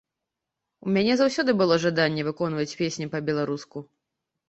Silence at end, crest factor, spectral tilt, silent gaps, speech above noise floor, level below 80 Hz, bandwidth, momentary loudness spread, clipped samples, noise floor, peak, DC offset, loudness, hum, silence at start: 0.65 s; 20 dB; -5.5 dB/octave; none; 61 dB; -64 dBFS; 8.2 kHz; 12 LU; under 0.1%; -85 dBFS; -6 dBFS; under 0.1%; -24 LUFS; none; 0.85 s